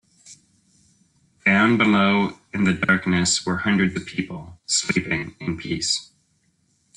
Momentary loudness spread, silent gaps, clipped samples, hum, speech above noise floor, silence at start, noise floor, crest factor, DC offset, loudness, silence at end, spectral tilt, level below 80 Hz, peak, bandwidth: 13 LU; none; under 0.1%; none; 44 dB; 0.25 s; -66 dBFS; 18 dB; under 0.1%; -21 LUFS; 0.95 s; -4 dB/octave; -54 dBFS; -6 dBFS; 10.5 kHz